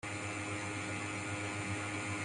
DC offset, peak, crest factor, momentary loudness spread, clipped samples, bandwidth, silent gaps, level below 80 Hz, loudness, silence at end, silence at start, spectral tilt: under 0.1%; -28 dBFS; 12 dB; 1 LU; under 0.1%; 11.5 kHz; none; -68 dBFS; -39 LUFS; 0 s; 0.05 s; -4 dB/octave